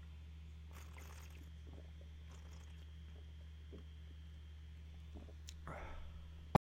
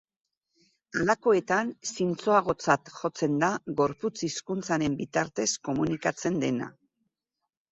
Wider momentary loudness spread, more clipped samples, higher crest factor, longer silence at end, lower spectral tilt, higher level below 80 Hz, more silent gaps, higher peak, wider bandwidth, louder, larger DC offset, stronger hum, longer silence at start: second, 4 LU vs 9 LU; neither; first, 32 dB vs 22 dB; second, 0.1 s vs 1.05 s; first, -6.5 dB/octave vs -4.5 dB/octave; first, -54 dBFS vs -62 dBFS; neither; second, -18 dBFS vs -8 dBFS; first, 16 kHz vs 8.4 kHz; second, -53 LUFS vs -28 LUFS; neither; neither; second, 0 s vs 0.95 s